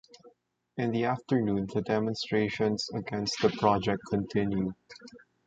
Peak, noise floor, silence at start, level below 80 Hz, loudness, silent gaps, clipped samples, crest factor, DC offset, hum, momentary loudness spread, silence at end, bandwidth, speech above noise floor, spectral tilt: -8 dBFS; -62 dBFS; 0.25 s; -58 dBFS; -30 LUFS; none; under 0.1%; 22 dB; under 0.1%; none; 9 LU; 0.3 s; 8.8 kHz; 32 dB; -6 dB/octave